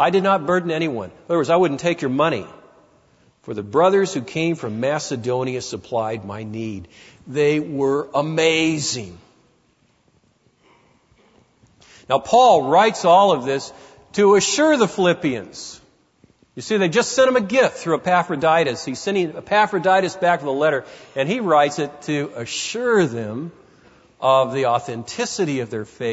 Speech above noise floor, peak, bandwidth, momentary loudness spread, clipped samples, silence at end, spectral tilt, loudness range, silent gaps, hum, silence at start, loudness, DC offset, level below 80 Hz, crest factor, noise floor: 42 dB; -4 dBFS; 8 kHz; 14 LU; under 0.1%; 0 s; -4.5 dB/octave; 7 LU; none; none; 0 s; -19 LUFS; under 0.1%; -62 dBFS; 16 dB; -61 dBFS